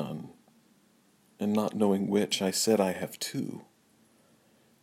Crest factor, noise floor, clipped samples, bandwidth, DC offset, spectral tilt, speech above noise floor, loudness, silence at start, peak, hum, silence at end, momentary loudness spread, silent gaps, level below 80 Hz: 20 dB; -65 dBFS; under 0.1%; 16 kHz; under 0.1%; -4.5 dB/octave; 37 dB; -29 LUFS; 0 s; -12 dBFS; none; 1.2 s; 15 LU; none; -78 dBFS